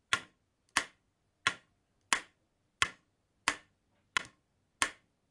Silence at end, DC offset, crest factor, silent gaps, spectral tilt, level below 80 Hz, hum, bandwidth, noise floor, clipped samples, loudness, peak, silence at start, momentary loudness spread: 0.4 s; under 0.1%; 34 dB; none; 0 dB/octave; -68 dBFS; none; 11.5 kHz; -77 dBFS; under 0.1%; -35 LUFS; -6 dBFS; 0.1 s; 9 LU